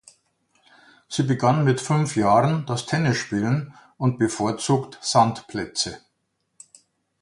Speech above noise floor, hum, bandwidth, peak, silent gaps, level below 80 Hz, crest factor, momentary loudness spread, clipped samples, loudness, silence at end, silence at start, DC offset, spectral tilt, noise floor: 52 dB; none; 11.5 kHz; -4 dBFS; none; -58 dBFS; 20 dB; 8 LU; under 0.1%; -22 LUFS; 1.25 s; 1.1 s; under 0.1%; -5.5 dB/octave; -74 dBFS